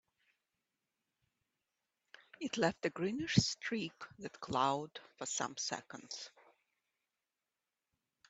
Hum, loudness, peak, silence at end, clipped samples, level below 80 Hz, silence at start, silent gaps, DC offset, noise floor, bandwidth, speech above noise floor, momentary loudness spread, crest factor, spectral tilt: none; -38 LUFS; -14 dBFS; 2 s; under 0.1%; -70 dBFS; 2.4 s; none; under 0.1%; under -90 dBFS; 8.2 kHz; over 52 dB; 16 LU; 28 dB; -4 dB/octave